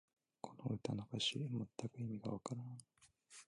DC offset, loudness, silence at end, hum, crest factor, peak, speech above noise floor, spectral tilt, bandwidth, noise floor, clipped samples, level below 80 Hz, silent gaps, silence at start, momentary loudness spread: under 0.1%; -45 LUFS; 0.05 s; none; 20 dB; -26 dBFS; 20 dB; -5 dB/octave; 11.5 kHz; -65 dBFS; under 0.1%; -76 dBFS; none; 0.45 s; 16 LU